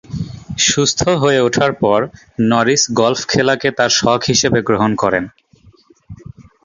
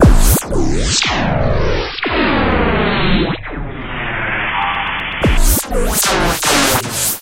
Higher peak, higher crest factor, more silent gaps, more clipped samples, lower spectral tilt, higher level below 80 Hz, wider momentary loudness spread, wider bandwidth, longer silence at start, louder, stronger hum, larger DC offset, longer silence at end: about the same, 0 dBFS vs 0 dBFS; about the same, 16 dB vs 14 dB; neither; neither; about the same, -3.5 dB/octave vs -3.5 dB/octave; second, -44 dBFS vs -18 dBFS; about the same, 8 LU vs 7 LU; second, 7.6 kHz vs 17 kHz; about the same, 0.1 s vs 0 s; about the same, -14 LUFS vs -15 LUFS; neither; neither; first, 0.2 s vs 0 s